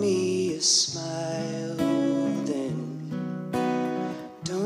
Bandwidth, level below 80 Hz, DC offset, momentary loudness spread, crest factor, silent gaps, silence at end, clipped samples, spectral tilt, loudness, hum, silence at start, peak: 15 kHz; -66 dBFS; under 0.1%; 12 LU; 18 dB; none; 0 s; under 0.1%; -4 dB/octave; -27 LUFS; none; 0 s; -10 dBFS